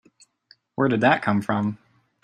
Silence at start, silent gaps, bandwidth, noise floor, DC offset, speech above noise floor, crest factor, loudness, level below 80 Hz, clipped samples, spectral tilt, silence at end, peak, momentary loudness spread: 0.8 s; none; 10.5 kHz; -59 dBFS; under 0.1%; 38 dB; 22 dB; -22 LUFS; -64 dBFS; under 0.1%; -7.5 dB/octave; 0.5 s; -4 dBFS; 16 LU